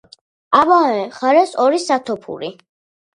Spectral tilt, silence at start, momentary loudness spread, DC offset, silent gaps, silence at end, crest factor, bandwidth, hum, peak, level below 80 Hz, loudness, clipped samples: -4 dB/octave; 0.5 s; 15 LU; under 0.1%; none; 0.6 s; 16 dB; 11 kHz; none; 0 dBFS; -64 dBFS; -15 LUFS; under 0.1%